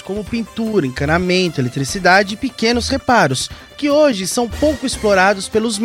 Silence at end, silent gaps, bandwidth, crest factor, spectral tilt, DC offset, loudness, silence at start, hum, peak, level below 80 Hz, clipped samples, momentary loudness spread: 0 s; none; 16.5 kHz; 16 dB; -4.5 dB/octave; under 0.1%; -16 LUFS; 0.05 s; none; 0 dBFS; -36 dBFS; under 0.1%; 9 LU